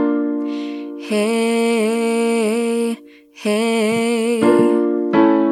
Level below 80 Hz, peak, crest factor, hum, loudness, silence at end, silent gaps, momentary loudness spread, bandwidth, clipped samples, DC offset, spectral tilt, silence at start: -66 dBFS; 0 dBFS; 16 dB; none; -17 LUFS; 0 s; none; 10 LU; 14 kHz; under 0.1%; under 0.1%; -5 dB/octave; 0 s